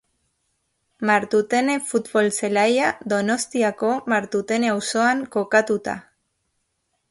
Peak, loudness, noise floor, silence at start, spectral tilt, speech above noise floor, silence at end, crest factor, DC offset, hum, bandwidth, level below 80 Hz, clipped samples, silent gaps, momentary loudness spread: -4 dBFS; -21 LUFS; -73 dBFS; 1 s; -4 dB/octave; 52 dB; 1.1 s; 18 dB; under 0.1%; none; 11.5 kHz; -64 dBFS; under 0.1%; none; 5 LU